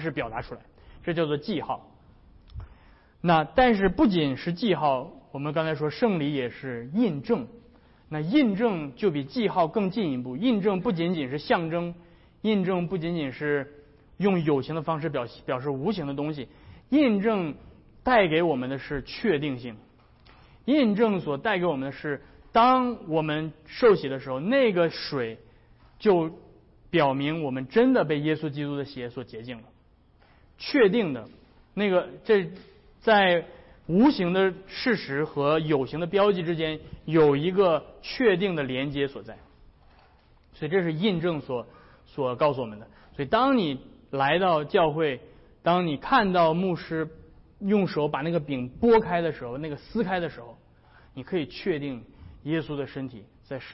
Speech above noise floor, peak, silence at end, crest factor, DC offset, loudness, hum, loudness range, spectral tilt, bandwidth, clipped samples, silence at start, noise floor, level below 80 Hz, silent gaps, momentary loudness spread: 34 dB; -10 dBFS; 0 s; 16 dB; under 0.1%; -26 LUFS; none; 5 LU; -10 dB/octave; 5.8 kHz; under 0.1%; 0 s; -59 dBFS; -54 dBFS; none; 15 LU